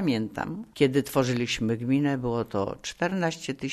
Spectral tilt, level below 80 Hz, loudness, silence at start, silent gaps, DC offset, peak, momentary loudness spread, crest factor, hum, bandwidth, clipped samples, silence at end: -5.5 dB/octave; -54 dBFS; -27 LUFS; 0 s; none; under 0.1%; -10 dBFS; 8 LU; 18 dB; none; 13.5 kHz; under 0.1%; 0 s